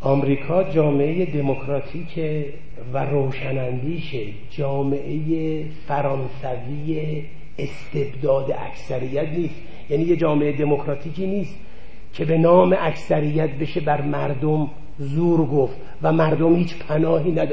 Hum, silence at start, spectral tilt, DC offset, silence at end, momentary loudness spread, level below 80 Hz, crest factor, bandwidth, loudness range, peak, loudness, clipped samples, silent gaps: none; 0 s; -9 dB/octave; 5%; 0 s; 11 LU; -46 dBFS; 18 dB; 8 kHz; 6 LU; -2 dBFS; -22 LUFS; under 0.1%; none